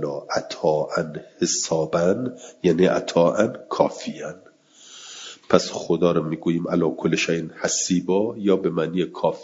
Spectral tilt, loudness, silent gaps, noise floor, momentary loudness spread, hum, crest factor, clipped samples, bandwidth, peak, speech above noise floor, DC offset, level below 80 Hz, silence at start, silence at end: -4.5 dB/octave; -22 LUFS; none; -49 dBFS; 12 LU; none; 22 dB; under 0.1%; 7.8 kHz; 0 dBFS; 27 dB; under 0.1%; -64 dBFS; 0 s; 0 s